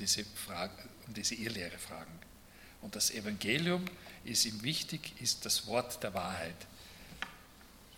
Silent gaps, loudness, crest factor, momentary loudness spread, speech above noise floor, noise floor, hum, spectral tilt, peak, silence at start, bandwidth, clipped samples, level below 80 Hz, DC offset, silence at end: none; -36 LUFS; 22 dB; 20 LU; 20 dB; -57 dBFS; none; -2.5 dB/octave; -16 dBFS; 0 s; 17.5 kHz; under 0.1%; -64 dBFS; under 0.1%; 0 s